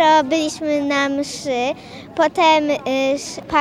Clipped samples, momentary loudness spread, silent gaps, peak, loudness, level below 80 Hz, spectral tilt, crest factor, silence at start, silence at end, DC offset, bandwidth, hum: under 0.1%; 10 LU; none; -2 dBFS; -18 LUFS; -54 dBFS; -3 dB/octave; 16 dB; 0 s; 0 s; under 0.1%; 14 kHz; none